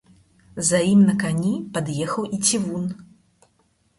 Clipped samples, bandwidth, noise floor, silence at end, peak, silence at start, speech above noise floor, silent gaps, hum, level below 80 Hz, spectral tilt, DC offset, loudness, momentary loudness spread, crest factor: under 0.1%; 11.5 kHz; -64 dBFS; 0.95 s; -6 dBFS; 0.55 s; 44 dB; none; none; -58 dBFS; -4.5 dB/octave; under 0.1%; -21 LUFS; 13 LU; 18 dB